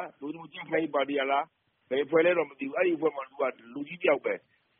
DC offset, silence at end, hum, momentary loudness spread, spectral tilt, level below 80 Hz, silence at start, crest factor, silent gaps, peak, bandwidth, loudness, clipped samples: under 0.1%; 0.4 s; none; 15 LU; -3 dB/octave; -78 dBFS; 0 s; 18 dB; none; -12 dBFS; 3.8 kHz; -29 LUFS; under 0.1%